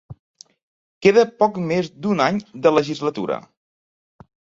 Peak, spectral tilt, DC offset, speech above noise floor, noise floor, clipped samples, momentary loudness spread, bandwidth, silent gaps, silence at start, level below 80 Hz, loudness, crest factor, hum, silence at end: -2 dBFS; -6 dB/octave; under 0.1%; over 71 dB; under -90 dBFS; under 0.1%; 10 LU; 7.8 kHz; 0.19-0.34 s, 0.63-1.01 s; 0.1 s; -60 dBFS; -19 LUFS; 20 dB; none; 1.2 s